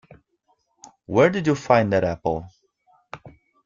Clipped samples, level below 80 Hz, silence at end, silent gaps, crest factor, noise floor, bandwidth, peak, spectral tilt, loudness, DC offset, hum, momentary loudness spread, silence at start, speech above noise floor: under 0.1%; -54 dBFS; 0.35 s; none; 20 dB; -68 dBFS; 7.6 kHz; -4 dBFS; -6.5 dB/octave; -21 LUFS; under 0.1%; none; 24 LU; 1.1 s; 48 dB